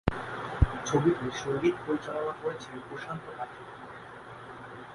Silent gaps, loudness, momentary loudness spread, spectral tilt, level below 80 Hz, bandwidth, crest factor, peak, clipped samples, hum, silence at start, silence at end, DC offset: none; -31 LUFS; 18 LU; -6 dB/octave; -42 dBFS; 11.5 kHz; 24 dB; -8 dBFS; under 0.1%; none; 0.05 s; 0 s; under 0.1%